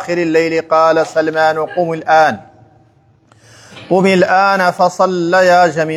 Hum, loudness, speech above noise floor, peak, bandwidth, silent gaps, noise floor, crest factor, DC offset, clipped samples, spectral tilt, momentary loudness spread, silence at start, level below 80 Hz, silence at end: none; -12 LUFS; 39 dB; 0 dBFS; 13.5 kHz; none; -50 dBFS; 14 dB; under 0.1%; under 0.1%; -5.5 dB/octave; 6 LU; 0 s; -62 dBFS; 0 s